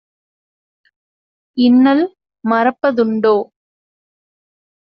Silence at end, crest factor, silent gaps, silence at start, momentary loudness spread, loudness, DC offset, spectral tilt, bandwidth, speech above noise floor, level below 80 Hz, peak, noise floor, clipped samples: 1.4 s; 14 dB; none; 1.55 s; 14 LU; -14 LUFS; under 0.1%; -4 dB/octave; 5.6 kHz; over 77 dB; -64 dBFS; -2 dBFS; under -90 dBFS; under 0.1%